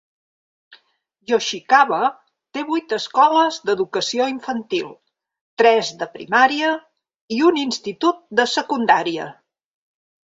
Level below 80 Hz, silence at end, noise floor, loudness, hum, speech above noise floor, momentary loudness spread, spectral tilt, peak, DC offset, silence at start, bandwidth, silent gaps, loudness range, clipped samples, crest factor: -68 dBFS; 1 s; -57 dBFS; -19 LUFS; none; 38 dB; 13 LU; -3 dB/octave; -2 dBFS; under 0.1%; 0.7 s; 8 kHz; 5.41-5.57 s, 7.21-7.28 s; 2 LU; under 0.1%; 18 dB